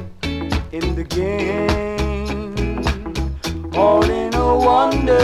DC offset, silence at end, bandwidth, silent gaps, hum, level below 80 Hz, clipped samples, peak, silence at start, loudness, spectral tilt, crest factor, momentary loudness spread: under 0.1%; 0 s; 14.5 kHz; none; none; -26 dBFS; under 0.1%; -2 dBFS; 0 s; -19 LUFS; -6 dB/octave; 16 dB; 10 LU